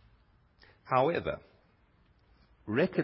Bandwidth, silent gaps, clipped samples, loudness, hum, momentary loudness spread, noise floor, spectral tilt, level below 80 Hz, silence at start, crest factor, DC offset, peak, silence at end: 5.6 kHz; none; under 0.1%; -31 LUFS; none; 15 LU; -66 dBFS; -5.5 dB/octave; -62 dBFS; 0.85 s; 22 dB; under 0.1%; -14 dBFS; 0 s